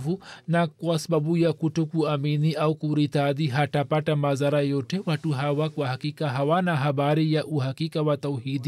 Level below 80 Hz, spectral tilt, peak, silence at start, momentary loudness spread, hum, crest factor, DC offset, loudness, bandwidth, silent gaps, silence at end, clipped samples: -70 dBFS; -7 dB/octave; -12 dBFS; 0 s; 5 LU; none; 12 dB; under 0.1%; -25 LUFS; 13 kHz; none; 0 s; under 0.1%